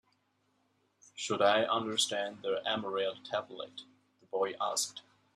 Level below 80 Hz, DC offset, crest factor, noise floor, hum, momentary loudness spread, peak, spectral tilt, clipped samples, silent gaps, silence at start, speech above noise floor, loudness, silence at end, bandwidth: -82 dBFS; under 0.1%; 22 dB; -75 dBFS; none; 17 LU; -14 dBFS; -2 dB/octave; under 0.1%; none; 1.15 s; 42 dB; -33 LUFS; 0.35 s; 13.5 kHz